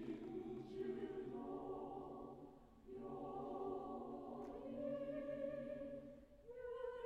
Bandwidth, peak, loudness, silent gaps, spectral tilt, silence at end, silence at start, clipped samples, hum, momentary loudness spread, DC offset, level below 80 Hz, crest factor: 11 kHz; -36 dBFS; -50 LUFS; none; -8 dB/octave; 0 s; 0 s; under 0.1%; none; 10 LU; under 0.1%; -70 dBFS; 14 dB